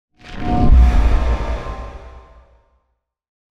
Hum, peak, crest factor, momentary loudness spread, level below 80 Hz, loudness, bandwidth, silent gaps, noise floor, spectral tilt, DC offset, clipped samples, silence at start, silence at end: none; -2 dBFS; 14 dB; 22 LU; -18 dBFS; -17 LUFS; 6.6 kHz; none; -70 dBFS; -8 dB/octave; under 0.1%; under 0.1%; 0.25 s; 1.3 s